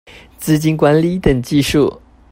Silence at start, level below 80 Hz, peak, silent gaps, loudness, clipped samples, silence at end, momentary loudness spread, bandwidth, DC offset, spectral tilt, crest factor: 0.15 s; -34 dBFS; 0 dBFS; none; -14 LUFS; under 0.1%; 0.35 s; 5 LU; 16.5 kHz; under 0.1%; -6 dB/octave; 14 dB